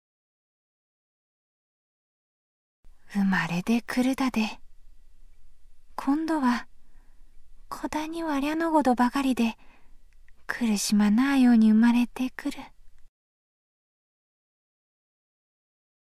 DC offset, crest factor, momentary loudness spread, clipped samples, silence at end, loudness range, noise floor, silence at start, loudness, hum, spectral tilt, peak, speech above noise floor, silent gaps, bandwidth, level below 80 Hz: under 0.1%; 18 dB; 14 LU; under 0.1%; 3.15 s; 9 LU; -47 dBFS; 2.85 s; -25 LUFS; none; -5 dB/octave; -10 dBFS; 23 dB; none; 15 kHz; -56 dBFS